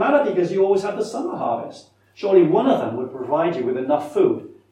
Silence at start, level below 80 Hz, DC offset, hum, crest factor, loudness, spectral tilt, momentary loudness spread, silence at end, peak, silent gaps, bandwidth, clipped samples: 0 s; -70 dBFS; under 0.1%; none; 18 dB; -20 LUFS; -7 dB/octave; 11 LU; 0.2 s; -2 dBFS; none; 10 kHz; under 0.1%